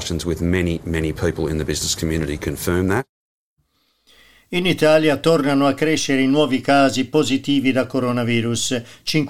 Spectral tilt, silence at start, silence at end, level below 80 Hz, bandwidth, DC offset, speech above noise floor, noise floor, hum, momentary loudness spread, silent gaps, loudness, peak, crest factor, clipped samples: -5 dB/octave; 0 s; 0 s; -42 dBFS; 16.5 kHz; under 0.1%; 47 dB; -65 dBFS; none; 8 LU; 3.09-3.57 s; -19 LUFS; -4 dBFS; 16 dB; under 0.1%